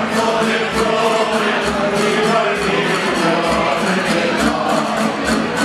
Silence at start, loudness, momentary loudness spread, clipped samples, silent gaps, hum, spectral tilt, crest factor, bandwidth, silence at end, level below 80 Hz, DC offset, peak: 0 s; -16 LUFS; 2 LU; under 0.1%; none; none; -4 dB/octave; 14 dB; 15 kHz; 0 s; -42 dBFS; under 0.1%; -2 dBFS